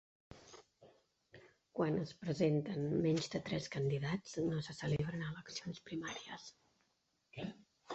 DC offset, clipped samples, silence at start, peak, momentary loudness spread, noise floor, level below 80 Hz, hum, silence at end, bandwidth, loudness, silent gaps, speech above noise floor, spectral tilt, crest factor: under 0.1%; under 0.1%; 0.3 s; -22 dBFS; 20 LU; -81 dBFS; -68 dBFS; none; 0 s; 8 kHz; -40 LUFS; none; 42 dB; -6 dB/octave; 18 dB